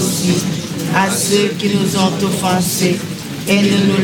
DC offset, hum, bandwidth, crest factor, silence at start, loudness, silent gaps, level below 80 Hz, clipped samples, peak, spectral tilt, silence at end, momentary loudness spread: under 0.1%; none; 17.5 kHz; 12 dB; 0 s; -15 LUFS; none; -50 dBFS; under 0.1%; -2 dBFS; -4.5 dB/octave; 0 s; 8 LU